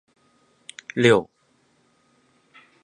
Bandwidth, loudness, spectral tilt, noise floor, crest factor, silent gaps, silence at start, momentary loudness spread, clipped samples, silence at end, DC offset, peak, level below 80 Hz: 11 kHz; -20 LUFS; -5.5 dB/octave; -64 dBFS; 24 dB; none; 0.95 s; 27 LU; under 0.1%; 1.6 s; under 0.1%; -2 dBFS; -64 dBFS